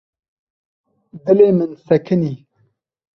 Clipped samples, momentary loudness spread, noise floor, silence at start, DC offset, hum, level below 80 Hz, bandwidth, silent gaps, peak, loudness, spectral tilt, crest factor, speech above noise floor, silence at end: under 0.1%; 14 LU; -63 dBFS; 1.15 s; under 0.1%; none; -60 dBFS; 6 kHz; none; 0 dBFS; -16 LUFS; -10 dB/octave; 18 dB; 48 dB; 0.8 s